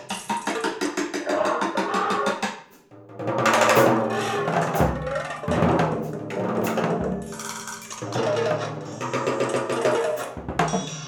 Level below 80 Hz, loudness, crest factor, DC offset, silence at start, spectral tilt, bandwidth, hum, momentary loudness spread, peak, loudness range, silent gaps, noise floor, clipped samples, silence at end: -46 dBFS; -24 LUFS; 20 dB; under 0.1%; 0 s; -5 dB/octave; over 20 kHz; none; 11 LU; -4 dBFS; 5 LU; none; -48 dBFS; under 0.1%; 0 s